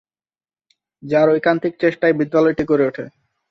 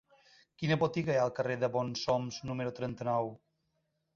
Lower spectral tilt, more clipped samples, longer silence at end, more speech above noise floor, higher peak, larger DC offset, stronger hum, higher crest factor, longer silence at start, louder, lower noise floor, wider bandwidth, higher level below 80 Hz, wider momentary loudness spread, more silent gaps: first, -8 dB/octave vs -6 dB/octave; neither; second, 0.4 s vs 0.8 s; first, over 73 dB vs 47 dB; first, -2 dBFS vs -16 dBFS; neither; neither; about the same, 16 dB vs 18 dB; first, 1.05 s vs 0.6 s; first, -17 LUFS vs -33 LUFS; first, under -90 dBFS vs -80 dBFS; second, 6.6 kHz vs 7.4 kHz; first, -54 dBFS vs -68 dBFS; about the same, 6 LU vs 7 LU; neither